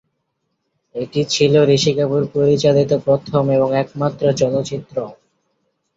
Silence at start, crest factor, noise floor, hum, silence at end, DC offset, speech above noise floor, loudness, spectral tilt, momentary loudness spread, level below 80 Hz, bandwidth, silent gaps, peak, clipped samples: 0.95 s; 16 dB; -72 dBFS; none; 0.85 s; under 0.1%; 56 dB; -17 LUFS; -6 dB/octave; 13 LU; -54 dBFS; 7.8 kHz; none; -2 dBFS; under 0.1%